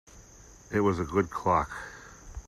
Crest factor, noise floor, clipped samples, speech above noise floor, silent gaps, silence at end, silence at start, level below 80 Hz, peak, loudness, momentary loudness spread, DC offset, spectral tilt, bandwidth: 20 dB; -52 dBFS; under 0.1%; 25 dB; none; 0.05 s; 0.15 s; -50 dBFS; -10 dBFS; -28 LUFS; 18 LU; under 0.1%; -6.5 dB/octave; 13.5 kHz